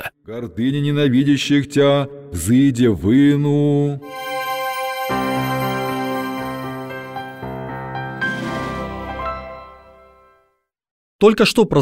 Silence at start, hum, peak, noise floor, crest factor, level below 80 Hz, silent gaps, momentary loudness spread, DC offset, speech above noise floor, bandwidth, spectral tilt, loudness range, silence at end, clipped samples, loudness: 0 s; none; 0 dBFS; -66 dBFS; 18 dB; -44 dBFS; 10.91-11.19 s; 15 LU; under 0.1%; 50 dB; 16 kHz; -6 dB/octave; 11 LU; 0 s; under 0.1%; -19 LUFS